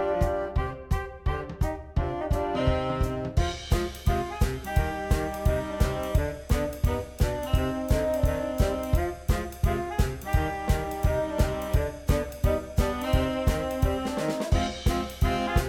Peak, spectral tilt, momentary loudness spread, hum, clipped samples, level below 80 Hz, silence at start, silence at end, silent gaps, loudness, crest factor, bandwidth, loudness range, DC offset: -10 dBFS; -6 dB/octave; 4 LU; none; under 0.1%; -30 dBFS; 0 s; 0 s; none; -28 LUFS; 16 dB; 18 kHz; 1 LU; under 0.1%